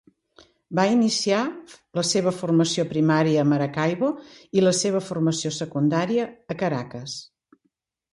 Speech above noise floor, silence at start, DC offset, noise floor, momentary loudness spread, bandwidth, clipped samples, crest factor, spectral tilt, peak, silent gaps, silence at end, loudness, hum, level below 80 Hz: 51 dB; 0.7 s; under 0.1%; -73 dBFS; 12 LU; 11.5 kHz; under 0.1%; 16 dB; -5 dB/octave; -8 dBFS; none; 0.9 s; -23 LUFS; none; -64 dBFS